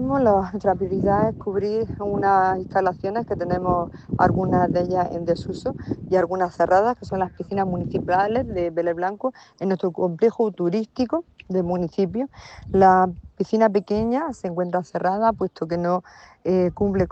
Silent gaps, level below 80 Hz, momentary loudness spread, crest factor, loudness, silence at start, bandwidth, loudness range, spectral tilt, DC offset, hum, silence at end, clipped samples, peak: none; -46 dBFS; 9 LU; 18 dB; -22 LUFS; 0 s; 8.4 kHz; 3 LU; -8.5 dB/octave; under 0.1%; none; 0 s; under 0.1%; -4 dBFS